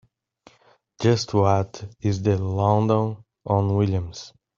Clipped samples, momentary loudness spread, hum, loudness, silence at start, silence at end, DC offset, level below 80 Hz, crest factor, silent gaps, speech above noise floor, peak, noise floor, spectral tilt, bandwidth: under 0.1%; 11 LU; none; -23 LUFS; 1 s; 0.3 s; under 0.1%; -56 dBFS; 18 dB; none; 38 dB; -4 dBFS; -59 dBFS; -7 dB/octave; 7.4 kHz